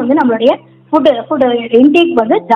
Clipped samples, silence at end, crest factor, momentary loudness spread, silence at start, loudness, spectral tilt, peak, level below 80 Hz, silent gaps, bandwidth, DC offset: 0.8%; 0 s; 10 dB; 5 LU; 0 s; -11 LUFS; -6.5 dB/octave; 0 dBFS; -54 dBFS; none; 7.2 kHz; under 0.1%